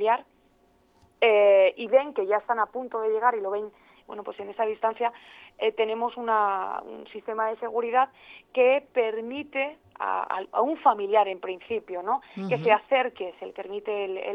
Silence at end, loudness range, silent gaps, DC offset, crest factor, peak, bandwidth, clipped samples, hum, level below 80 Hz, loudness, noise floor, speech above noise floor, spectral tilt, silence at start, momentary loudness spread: 0 s; 5 LU; none; under 0.1%; 20 dB; -6 dBFS; 5.6 kHz; under 0.1%; none; -74 dBFS; -26 LUFS; -63 dBFS; 37 dB; -7 dB/octave; 0 s; 13 LU